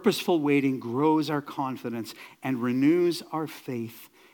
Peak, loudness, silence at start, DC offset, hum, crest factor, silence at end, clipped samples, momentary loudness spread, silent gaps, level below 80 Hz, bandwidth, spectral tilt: -10 dBFS; -27 LUFS; 0 s; under 0.1%; none; 16 dB; 0.3 s; under 0.1%; 13 LU; none; -80 dBFS; 18 kHz; -6 dB/octave